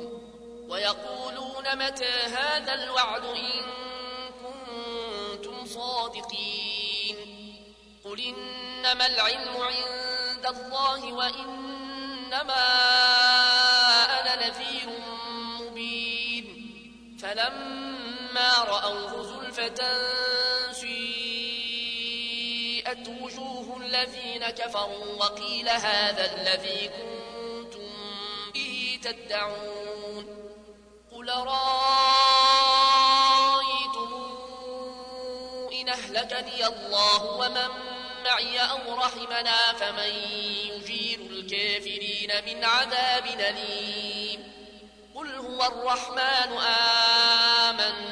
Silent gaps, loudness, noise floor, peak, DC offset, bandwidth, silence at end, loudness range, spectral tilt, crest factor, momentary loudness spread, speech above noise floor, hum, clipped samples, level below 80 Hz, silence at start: none; -25 LUFS; -52 dBFS; -8 dBFS; under 0.1%; 11 kHz; 0 s; 11 LU; -0.5 dB/octave; 18 dB; 19 LU; 25 dB; none; under 0.1%; -62 dBFS; 0 s